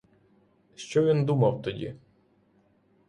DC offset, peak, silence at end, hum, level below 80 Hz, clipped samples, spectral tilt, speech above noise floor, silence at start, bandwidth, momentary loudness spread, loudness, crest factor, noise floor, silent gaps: under 0.1%; -12 dBFS; 1.1 s; none; -62 dBFS; under 0.1%; -7.5 dB/octave; 40 dB; 0.8 s; 10.5 kHz; 16 LU; -26 LUFS; 18 dB; -65 dBFS; none